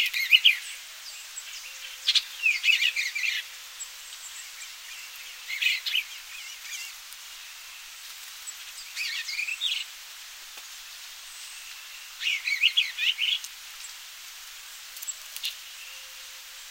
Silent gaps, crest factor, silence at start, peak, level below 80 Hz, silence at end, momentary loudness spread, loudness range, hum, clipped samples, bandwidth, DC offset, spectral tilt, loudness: none; 26 dB; 0 s; -4 dBFS; -72 dBFS; 0 s; 19 LU; 8 LU; none; under 0.1%; 16 kHz; under 0.1%; 6 dB/octave; -26 LUFS